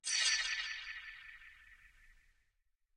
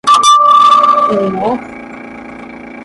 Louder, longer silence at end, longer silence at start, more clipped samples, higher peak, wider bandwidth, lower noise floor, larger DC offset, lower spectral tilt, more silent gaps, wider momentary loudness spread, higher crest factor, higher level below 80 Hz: second, -35 LUFS vs -8 LUFS; first, 0.85 s vs 0 s; about the same, 0.05 s vs 0.05 s; neither; second, -22 dBFS vs 0 dBFS; first, 16 kHz vs 11.5 kHz; first, -80 dBFS vs -29 dBFS; neither; second, 5 dB/octave vs -3 dB/octave; neither; about the same, 24 LU vs 23 LU; first, 20 dB vs 10 dB; second, -70 dBFS vs -50 dBFS